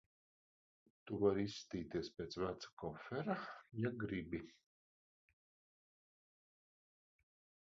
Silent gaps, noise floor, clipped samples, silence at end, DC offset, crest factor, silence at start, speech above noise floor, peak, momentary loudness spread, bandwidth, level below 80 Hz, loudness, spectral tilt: 2.73-2.77 s; under -90 dBFS; under 0.1%; 3.1 s; under 0.1%; 24 dB; 1.05 s; over 47 dB; -22 dBFS; 12 LU; 7.4 kHz; -70 dBFS; -44 LUFS; -5.5 dB/octave